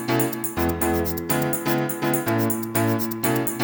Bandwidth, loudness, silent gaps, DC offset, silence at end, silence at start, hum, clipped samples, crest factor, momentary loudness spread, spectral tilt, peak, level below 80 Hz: over 20 kHz; -23 LUFS; none; under 0.1%; 0 s; 0 s; none; under 0.1%; 16 dB; 2 LU; -5 dB/octave; -6 dBFS; -44 dBFS